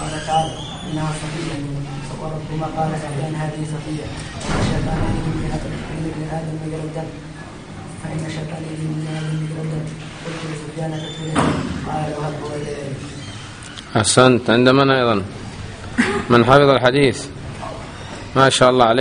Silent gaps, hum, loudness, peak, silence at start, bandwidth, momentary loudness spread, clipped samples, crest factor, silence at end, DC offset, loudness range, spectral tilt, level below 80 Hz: none; none; -19 LUFS; 0 dBFS; 0 s; 10 kHz; 19 LU; under 0.1%; 20 dB; 0 s; under 0.1%; 11 LU; -5 dB/octave; -38 dBFS